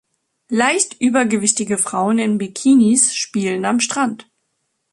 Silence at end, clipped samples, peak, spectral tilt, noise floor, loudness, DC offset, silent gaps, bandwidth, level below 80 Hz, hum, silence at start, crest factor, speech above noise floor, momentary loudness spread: 0.7 s; under 0.1%; 0 dBFS; -3 dB/octave; -71 dBFS; -16 LUFS; under 0.1%; none; 11.5 kHz; -62 dBFS; none; 0.5 s; 18 dB; 54 dB; 7 LU